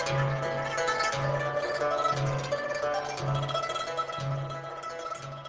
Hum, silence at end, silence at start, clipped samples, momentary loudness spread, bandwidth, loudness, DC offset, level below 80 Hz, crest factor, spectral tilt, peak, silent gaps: none; 0 s; 0 s; under 0.1%; 9 LU; 8 kHz; -30 LUFS; under 0.1%; -56 dBFS; 16 dB; -5 dB/octave; -16 dBFS; none